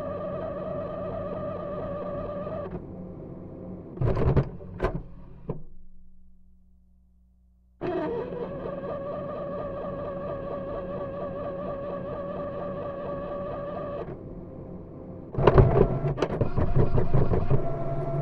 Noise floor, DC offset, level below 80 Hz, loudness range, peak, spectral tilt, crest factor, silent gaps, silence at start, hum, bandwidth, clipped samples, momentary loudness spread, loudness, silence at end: -60 dBFS; under 0.1%; -36 dBFS; 11 LU; -2 dBFS; -10 dB/octave; 26 dB; none; 0 s; 60 Hz at -55 dBFS; 5 kHz; under 0.1%; 16 LU; -30 LUFS; 0 s